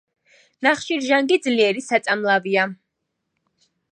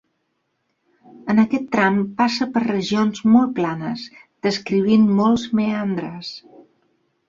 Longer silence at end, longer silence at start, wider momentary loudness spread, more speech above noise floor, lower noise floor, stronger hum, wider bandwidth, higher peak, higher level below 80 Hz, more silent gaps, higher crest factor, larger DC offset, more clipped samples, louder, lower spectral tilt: first, 1.15 s vs 0.9 s; second, 0.6 s vs 1.15 s; second, 4 LU vs 15 LU; first, 58 dB vs 53 dB; first, -77 dBFS vs -71 dBFS; neither; first, 9.8 kHz vs 7.4 kHz; about the same, -2 dBFS vs -4 dBFS; second, -74 dBFS vs -60 dBFS; neither; about the same, 20 dB vs 16 dB; neither; neither; about the same, -20 LUFS vs -19 LUFS; second, -3.5 dB/octave vs -6 dB/octave